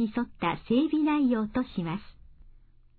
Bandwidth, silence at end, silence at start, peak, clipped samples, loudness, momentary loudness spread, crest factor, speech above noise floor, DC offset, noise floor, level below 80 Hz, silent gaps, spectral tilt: 4.6 kHz; 0.55 s; 0 s; -14 dBFS; under 0.1%; -28 LUFS; 9 LU; 14 dB; 27 dB; under 0.1%; -54 dBFS; -54 dBFS; none; -10.5 dB/octave